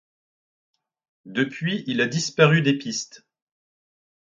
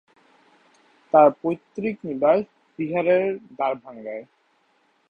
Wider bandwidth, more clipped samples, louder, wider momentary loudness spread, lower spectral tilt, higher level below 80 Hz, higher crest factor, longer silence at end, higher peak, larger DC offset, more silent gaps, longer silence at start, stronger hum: first, 7.6 kHz vs 6.2 kHz; neither; about the same, -22 LUFS vs -22 LUFS; second, 13 LU vs 18 LU; second, -5 dB/octave vs -8.5 dB/octave; about the same, -68 dBFS vs -68 dBFS; about the same, 24 dB vs 22 dB; first, 1.15 s vs 0.85 s; about the same, -2 dBFS vs -2 dBFS; neither; neither; about the same, 1.25 s vs 1.15 s; neither